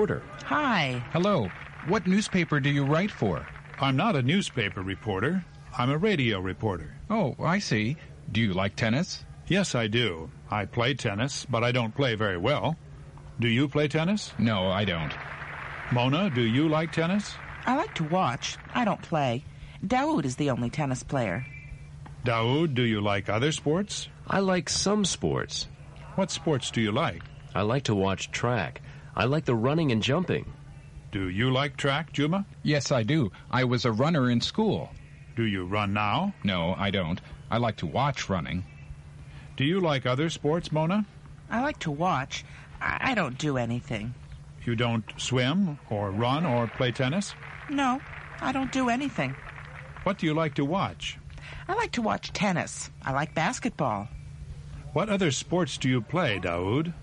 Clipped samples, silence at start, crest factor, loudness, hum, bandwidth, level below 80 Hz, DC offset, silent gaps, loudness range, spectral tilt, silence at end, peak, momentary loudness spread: under 0.1%; 0 s; 18 dB; -28 LUFS; none; 10.5 kHz; -50 dBFS; under 0.1%; none; 3 LU; -5.5 dB/octave; 0 s; -10 dBFS; 12 LU